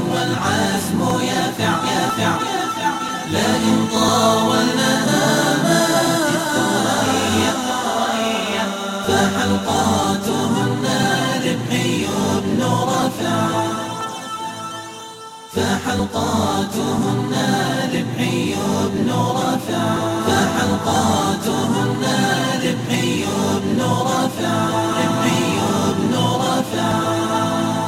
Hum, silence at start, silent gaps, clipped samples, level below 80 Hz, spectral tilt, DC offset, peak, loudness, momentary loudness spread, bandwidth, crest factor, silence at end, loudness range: none; 0 s; none; under 0.1%; -50 dBFS; -4.5 dB/octave; under 0.1%; -4 dBFS; -18 LUFS; 5 LU; 16.5 kHz; 14 dB; 0 s; 5 LU